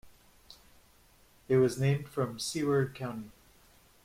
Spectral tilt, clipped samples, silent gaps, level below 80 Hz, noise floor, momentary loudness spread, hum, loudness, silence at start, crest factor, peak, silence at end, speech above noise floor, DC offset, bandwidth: -6 dB/octave; under 0.1%; none; -64 dBFS; -62 dBFS; 13 LU; none; -31 LUFS; 0.05 s; 18 dB; -16 dBFS; 0.75 s; 32 dB; under 0.1%; 16 kHz